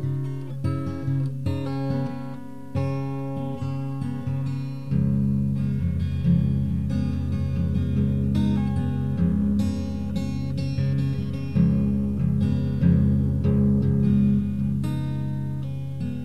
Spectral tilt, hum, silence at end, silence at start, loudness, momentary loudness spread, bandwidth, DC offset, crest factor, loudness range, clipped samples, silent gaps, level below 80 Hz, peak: -9.5 dB/octave; none; 0 s; 0 s; -25 LUFS; 9 LU; 8.8 kHz; 1%; 16 dB; 7 LU; under 0.1%; none; -40 dBFS; -8 dBFS